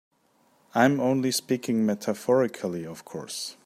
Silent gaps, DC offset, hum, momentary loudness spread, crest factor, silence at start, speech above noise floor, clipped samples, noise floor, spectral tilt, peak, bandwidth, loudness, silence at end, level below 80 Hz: none; under 0.1%; none; 13 LU; 20 dB; 0.75 s; 39 dB; under 0.1%; -65 dBFS; -5 dB/octave; -6 dBFS; 15.5 kHz; -26 LUFS; 0.1 s; -72 dBFS